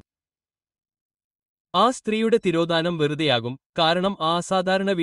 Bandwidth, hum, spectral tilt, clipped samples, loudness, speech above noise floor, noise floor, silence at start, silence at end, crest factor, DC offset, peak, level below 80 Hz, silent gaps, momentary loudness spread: 11.5 kHz; none; -5 dB/octave; under 0.1%; -22 LUFS; over 68 dB; under -90 dBFS; 1.75 s; 0 s; 18 dB; under 0.1%; -6 dBFS; -62 dBFS; 3.66-3.73 s; 3 LU